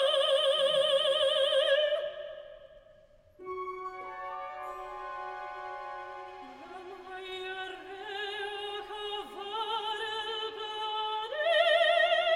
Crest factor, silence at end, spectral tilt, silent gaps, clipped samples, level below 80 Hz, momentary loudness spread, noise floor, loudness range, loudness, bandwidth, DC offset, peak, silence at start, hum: 18 dB; 0 s; -1 dB/octave; none; under 0.1%; -68 dBFS; 18 LU; -59 dBFS; 12 LU; -30 LUFS; 15.5 kHz; under 0.1%; -14 dBFS; 0 s; none